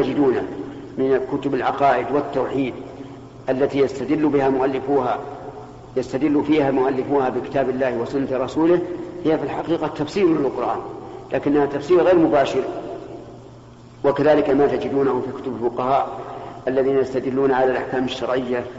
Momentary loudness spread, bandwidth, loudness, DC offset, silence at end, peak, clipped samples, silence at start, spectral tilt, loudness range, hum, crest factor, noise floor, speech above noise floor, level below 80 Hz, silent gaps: 15 LU; 8 kHz; -20 LUFS; under 0.1%; 0 s; -6 dBFS; under 0.1%; 0 s; -5.5 dB/octave; 2 LU; none; 14 dB; -42 dBFS; 23 dB; -52 dBFS; none